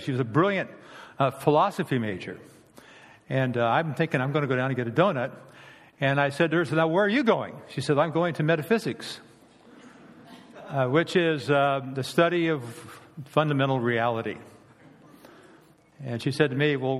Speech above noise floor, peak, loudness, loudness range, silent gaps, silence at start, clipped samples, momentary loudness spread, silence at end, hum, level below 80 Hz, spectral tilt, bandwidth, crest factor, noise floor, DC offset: 31 dB; -6 dBFS; -25 LUFS; 4 LU; none; 0 s; under 0.1%; 15 LU; 0 s; none; -70 dBFS; -6.5 dB/octave; 14.5 kHz; 20 dB; -56 dBFS; under 0.1%